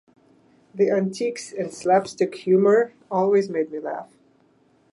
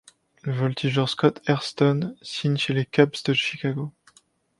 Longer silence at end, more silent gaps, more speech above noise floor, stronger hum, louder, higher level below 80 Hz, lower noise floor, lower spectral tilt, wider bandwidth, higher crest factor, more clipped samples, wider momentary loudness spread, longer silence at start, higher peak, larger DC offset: first, 0.9 s vs 0.7 s; neither; about the same, 39 dB vs 38 dB; neither; about the same, -22 LUFS vs -24 LUFS; second, -74 dBFS vs -64 dBFS; about the same, -60 dBFS vs -61 dBFS; about the same, -6 dB/octave vs -6 dB/octave; about the same, 11.5 kHz vs 11.5 kHz; second, 16 dB vs 22 dB; neither; first, 13 LU vs 10 LU; first, 0.75 s vs 0.45 s; second, -8 dBFS vs -2 dBFS; neither